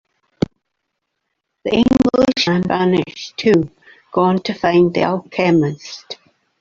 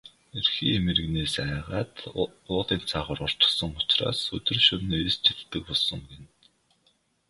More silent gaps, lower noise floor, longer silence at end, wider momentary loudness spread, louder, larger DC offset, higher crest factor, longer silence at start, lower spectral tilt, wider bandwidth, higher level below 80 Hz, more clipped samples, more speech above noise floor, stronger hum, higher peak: neither; first, -75 dBFS vs -68 dBFS; second, 0.45 s vs 1.05 s; first, 14 LU vs 11 LU; first, -16 LUFS vs -25 LUFS; neither; second, 16 dB vs 22 dB; first, 1.65 s vs 0.05 s; first, -6.5 dB/octave vs -4.5 dB/octave; second, 7.6 kHz vs 11.5 kHz; about the same, -46 dBFS vs -46 dBFS; neither; first, 59 dB vs 41 dB; neither; first, -2 dBFS vs -6 dBFS